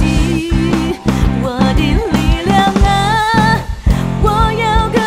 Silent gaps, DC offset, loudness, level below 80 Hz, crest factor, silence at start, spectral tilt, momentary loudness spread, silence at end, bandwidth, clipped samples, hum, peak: none; under 0.1%; -13 LUFS; -18 dBFS; 12 dB; 0 s; -6 dB/octave; 4 LU; 0 s; 15.5 kHz; under 0.1%; none; 0 dBFS